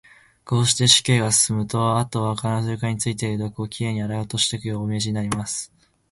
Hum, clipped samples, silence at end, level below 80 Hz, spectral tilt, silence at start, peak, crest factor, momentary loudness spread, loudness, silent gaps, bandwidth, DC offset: none; under 0.1%; 0.45 s; -52 dBFS; -3.5 dB/octave; 0.45 s; -2 dBFS; 22 dB; 12 LU; -21 LUFS; none; 12 kHz; under 0.1%